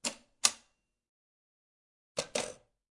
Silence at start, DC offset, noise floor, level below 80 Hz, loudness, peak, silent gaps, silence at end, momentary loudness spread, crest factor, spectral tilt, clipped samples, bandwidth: 0.05 s; under 0.1%; -72 dBFS; -74 dBFS; -33 LUFS; -6 dBFS; 1.09-2.15 s; 0.4 s; 13 LU; 34 dB; 0 dB/octave; under 0.1%; 11.5 kHz